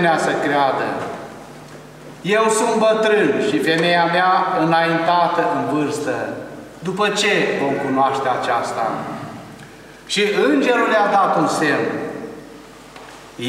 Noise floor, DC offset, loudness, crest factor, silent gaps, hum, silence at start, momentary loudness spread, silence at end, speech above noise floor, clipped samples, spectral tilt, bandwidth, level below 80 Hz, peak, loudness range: -40 dBFS; under 0.1%; -17 LUFS; 14 dB; none; none; 0 s; 21 LU; 0 s; 23 dB; under 0.1%; -4.5 dB/octave; 15.5 kHz; -58 dBFS; -4 dBFS; 4 LU